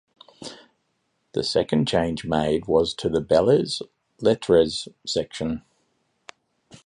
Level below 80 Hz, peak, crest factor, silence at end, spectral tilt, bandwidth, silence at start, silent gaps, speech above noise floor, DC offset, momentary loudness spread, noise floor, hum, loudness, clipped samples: -50 dBFS; -4 dBFS; 20 dB; 1.25 s; -5.5 dB/octave; 11 kHz; 0.4 s; none; 50 dB; under 0.1%; 16 LU; -72 dBFS; none; -23 LUFS; under 0.1%